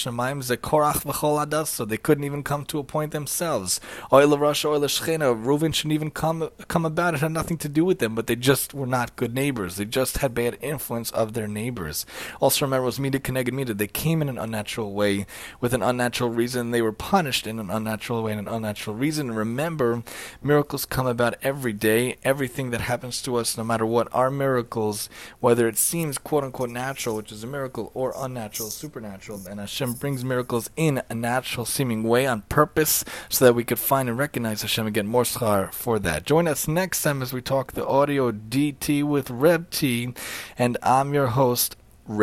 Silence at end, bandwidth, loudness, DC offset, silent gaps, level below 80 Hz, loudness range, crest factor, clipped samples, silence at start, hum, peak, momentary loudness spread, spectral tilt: 0 s; 16.5 kHz; -24 LUFS; under 0.1%; none; -50 dBFS; 5 LU; 22 dB; under 0.1%; 0 s; none; -2 dBFS; 9 LU; -4.5 dB/octave